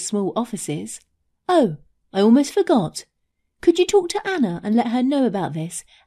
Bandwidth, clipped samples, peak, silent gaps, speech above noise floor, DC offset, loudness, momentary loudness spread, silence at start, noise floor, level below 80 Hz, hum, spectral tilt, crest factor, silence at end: 14 kHz; under 0.1%; -4 dBFS; none; 50 dB; under 0.1%; -20 LUFS; 14 LU; 0 s; -70 dBFS; -58 dBFS; none; -5 dB/octave; 16 dB; 0.25 s